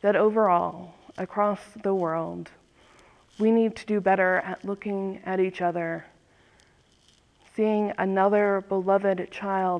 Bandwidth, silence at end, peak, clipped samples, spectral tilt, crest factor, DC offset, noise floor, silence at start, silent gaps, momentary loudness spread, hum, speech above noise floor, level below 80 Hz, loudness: 10 kHz; 0 s; -10 dBFS; under 0.1%; -7.5 dB/octave; 16 dB; under 0.1%; -61 dBFS; 0 s; none; 13 LU; none; 36 dB; -66 dBFS; -25 LUFS